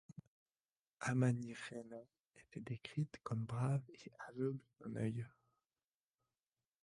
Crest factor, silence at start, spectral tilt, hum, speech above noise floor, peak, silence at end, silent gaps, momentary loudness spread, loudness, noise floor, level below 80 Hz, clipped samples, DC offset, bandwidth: 20 dB; 0.1 s; -7 dB/octave; none; over 48 dB; -24 dBFS; 1.55 s; 0.27-0.46 s, 0.72-0.86 s, 2.20-2.30 s; 18 LU; -43 LUFS; under -90 dBFS; -78 dBFS; under 0.1%; under 0.1%; 11.5 kHz